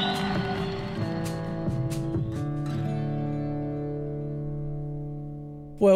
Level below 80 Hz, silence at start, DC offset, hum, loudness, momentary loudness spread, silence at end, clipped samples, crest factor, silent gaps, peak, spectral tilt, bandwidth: -44 dBFS; 0 s; under 0.1%; none; -31 LUFS; 7 LU; 0 s; under 0.1%; 18 dB; none; -10 dBFS; -7 dB/octave; 14 kHz